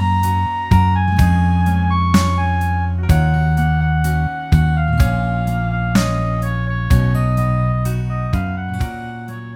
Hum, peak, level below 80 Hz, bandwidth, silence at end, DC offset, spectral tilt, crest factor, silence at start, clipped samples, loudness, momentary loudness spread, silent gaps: none; -2 dBFS; -24 dBFS; 16.5 kHz; 0 s; under 0.1%; -7 dB/octave; 14 dB; 0 s; under 0.1%; -17 LUFS; 6 LU; none